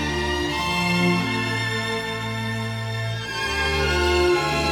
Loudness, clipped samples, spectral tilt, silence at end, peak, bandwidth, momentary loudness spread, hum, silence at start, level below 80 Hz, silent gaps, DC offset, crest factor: -22 LUFS; under 0.1%; -4.5 dB/octave; 0 s; -10 dBFS; 18 kHz; 8 LU; none; 0 s; -36 dBFS; none; under 0.1%; 14 dB